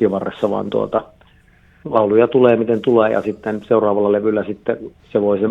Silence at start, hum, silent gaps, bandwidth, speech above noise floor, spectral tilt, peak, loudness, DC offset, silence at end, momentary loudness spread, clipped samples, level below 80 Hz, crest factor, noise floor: 0 s; none; none; 5 kHz; 34 dB; -8.5 dB/octave; 0 dBFS; -17 LUFS; under 0.1%; 0 s; 10 LU; under 0.1%; -54 dBFS; 16 dB; -51 dBFS